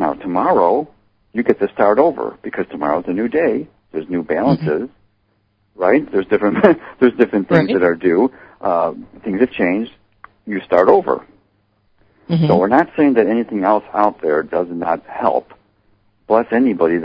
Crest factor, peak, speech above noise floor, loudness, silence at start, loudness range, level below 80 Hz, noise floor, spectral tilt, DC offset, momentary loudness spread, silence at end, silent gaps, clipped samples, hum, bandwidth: 16 dB; 0 dBFS; 47 dB; -16 LUFS; 0 s; 4 LU; -52 dBFS; -62 dBFS; -9.5 dB/octave; under 0.1%; 12 LU; 0 s; none; under 0.1%; none; 5.4 kHz